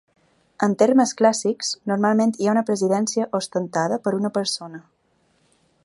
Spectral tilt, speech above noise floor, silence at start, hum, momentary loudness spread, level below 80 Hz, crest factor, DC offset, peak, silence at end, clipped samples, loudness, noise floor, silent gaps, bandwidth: -4.5 dB/octave; 44 dB; 0.6 s; none; 8 LU; -72 dBFS; 18 dB; under 0.1%; -4 dBFS; 1.05 s; under 0.1%; -21 LUFS; -65 dBFS; none; 11.5 kHz